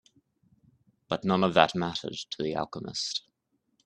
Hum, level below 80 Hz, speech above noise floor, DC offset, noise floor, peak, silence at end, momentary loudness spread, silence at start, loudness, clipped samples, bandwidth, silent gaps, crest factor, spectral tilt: none; -66 dBFS; 48 dB; under 0.1%; -76 dBFS; -2 dBFS; 0.65 s; 12 LU; 1.1 s; -29 LUFS; under 0.1%; 9.4 kHz; none; 28 dB; -4.5 dB/octave